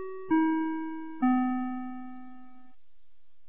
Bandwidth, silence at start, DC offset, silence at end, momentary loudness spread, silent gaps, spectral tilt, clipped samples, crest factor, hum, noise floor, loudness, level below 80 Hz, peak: 3.5 kHz; 0 s; 0.8%; 1 s; 19 LU; none; -4.5 dB/octave; under 0.1%; 16 dB; none; -70 dBFS; -30 LUFS; -70 dBFS; -14 dBFS